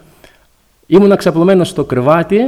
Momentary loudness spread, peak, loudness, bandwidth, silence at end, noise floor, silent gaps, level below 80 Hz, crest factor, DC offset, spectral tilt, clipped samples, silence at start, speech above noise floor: 5 LU; 0 dBFS; -11 LUFS; 14 kHz; 0 s; -52 dBFS; none; -46 dBFS; 12 dB; under 0.1%; -7 dB/octave; under 0.1%; 0.9 s; 43 dB